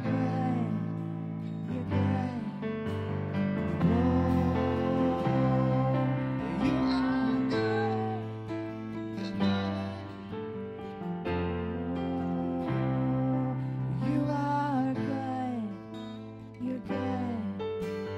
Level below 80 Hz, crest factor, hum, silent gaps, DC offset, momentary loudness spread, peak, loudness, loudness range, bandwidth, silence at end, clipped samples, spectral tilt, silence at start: -52 dBFS; 16 dB; none; none; under 0.1%; 10 LU; -14 dBFS; -31 LUFS; 6 LU; 8.6 kHz; 0 s; under 0.1%; -8.5 dB/octave; 0 s